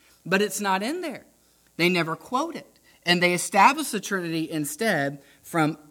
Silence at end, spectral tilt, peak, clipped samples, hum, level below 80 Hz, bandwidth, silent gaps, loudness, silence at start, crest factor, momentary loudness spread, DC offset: 0.15 s; -4 dB/octave; -4 dBFS; under 0.1%; none; -70 dBFS; 18.5 kHz; none; -24 LUFS; 0.25 s; 20 dB; 14 LU; under 0.1%